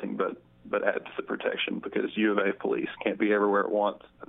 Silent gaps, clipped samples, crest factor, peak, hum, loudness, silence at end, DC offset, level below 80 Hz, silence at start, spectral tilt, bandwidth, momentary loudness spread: none; under 0.1%; 20 dB; -8 dBFS; none; -28 LUFS; 0.05 s; under 0.1%; -70 dBFS; 0 s; -3 dB/octave; 4 kHz; 8 LU